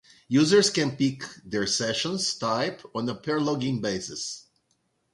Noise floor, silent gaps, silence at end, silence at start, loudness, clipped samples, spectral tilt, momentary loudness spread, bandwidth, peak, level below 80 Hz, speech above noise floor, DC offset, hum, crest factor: -72 dBFS; none; 0.75 s; 0.3 s; -26 LUFS; under 0.1%; -4 dB/octave; 13 LU; 11.5 kHz; -8 dBFS; -62 dBFS; 47 dB; under 0.1%; none; 18 dB